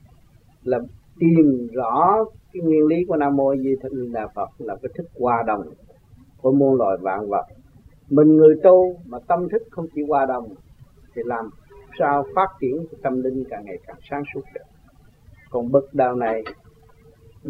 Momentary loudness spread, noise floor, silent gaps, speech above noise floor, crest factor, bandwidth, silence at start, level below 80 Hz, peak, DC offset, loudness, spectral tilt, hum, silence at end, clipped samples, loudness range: 18 LU; -52 dBFS; none; 33 dB; 20 dB; 4.9 kHz; 0.65 s; -54 dBFS; -2 dBFS; under 0.1%; -20 LUFS; -10.5 dB/octave; none; 0 s; under 0.1%; 8 LU